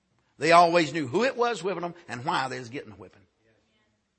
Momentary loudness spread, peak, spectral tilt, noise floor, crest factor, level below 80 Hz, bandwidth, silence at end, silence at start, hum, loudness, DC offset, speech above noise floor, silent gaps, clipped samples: 17 LU; -4 dBFS; -4.5 dB/octave; -71 dBFS; 22 dB; -72 dBFS; 8.8 kHz; 1.1 s; 0.4 s; none; -25 LUFS; under 0.1%; 46 dB; none; under 0.1%